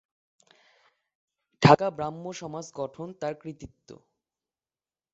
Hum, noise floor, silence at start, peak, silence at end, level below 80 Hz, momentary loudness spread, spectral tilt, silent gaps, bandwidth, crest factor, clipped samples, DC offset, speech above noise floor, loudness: none; under -90 dBFS; 1.6 s; -2 dBFS; 1.2 s; -62 dBFS; 22 LU; -5.5 dB/octave; none; 7.6 kHz; 28 dB; under 0.1%; under 0.1%; over 61 dB; -26 LUFS